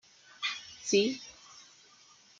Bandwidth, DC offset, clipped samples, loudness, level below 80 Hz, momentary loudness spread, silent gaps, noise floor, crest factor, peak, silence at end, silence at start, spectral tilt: 9.2 kHz; under 0.1%; under 0.1%; -32 LUFS; -78 dBFS; 24 LU; none; -60 dBFS; 22 dB; -14 dBFS; 0.8 s; 0.4 s; -2.5 dB/octave